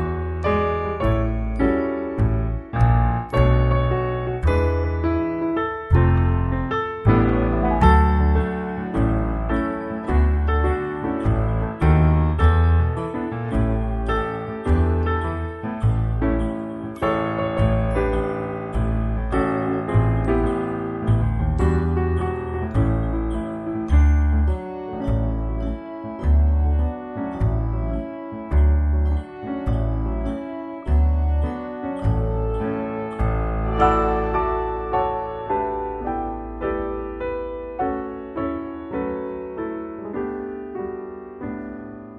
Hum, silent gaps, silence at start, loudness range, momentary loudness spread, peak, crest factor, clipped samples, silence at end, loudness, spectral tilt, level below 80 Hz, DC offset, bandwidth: none; none; 0 s; 7 LU; 11 LU; -2 dBFS; 18 dB; under 0.1%; 0 s; -22 LUFS; -9.5 dB/octave; -24 dBFS; under 0.1%; 5 kHz